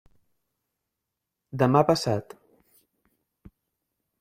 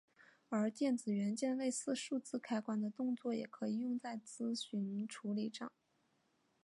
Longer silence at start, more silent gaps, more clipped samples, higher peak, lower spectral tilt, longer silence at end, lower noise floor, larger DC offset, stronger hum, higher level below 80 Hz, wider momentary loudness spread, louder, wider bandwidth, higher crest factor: first, 1.55 s vs 0.2 s; neither; neither; first, -6 dBFS vs -26 dBFS; first, -6.5 dB/octave vs -5 dB/octave; first, 2 s vs 0.95 s; first, -85 dBFS vs -79 dBFS; neither; neither; first, -62 dBFS vs under -90 dBFS; first, 12 LU vs 6 LU; first, -23 LUFS vs -40 LUFS; first, 15.5 kHz vs 11.5 kHz; first, 24 dB vs 16 dB